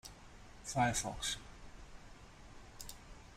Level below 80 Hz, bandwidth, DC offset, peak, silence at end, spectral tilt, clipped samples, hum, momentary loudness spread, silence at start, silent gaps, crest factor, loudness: -56 dBFS; 16 kHz; under 0.1%; -22 dBFS; 0 s; -3 dB/octave; under 0.1%; none; 23 LU; 0.05 s; none; 22 dB; -39 LUFS